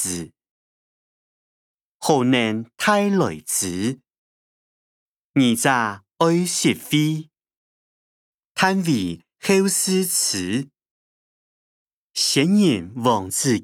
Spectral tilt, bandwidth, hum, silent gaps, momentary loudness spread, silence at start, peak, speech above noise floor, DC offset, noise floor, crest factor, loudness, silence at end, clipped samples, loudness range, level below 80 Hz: -4 dB/octave; 19 kHz; none; 0.51-2.00 s, 4.18-5.34 s, 7.56-8.39 s, 8.45-8.55 s, 10.91-11.86 s, 11.93-12.10 s; 10 LU; 0 s; -2 dBFS; over 70 dB; under 0.1%; under -90 dBFS; 20 dB; -20 LUFS; 0 s; under 0.1%; 2 LU; -66 dBFS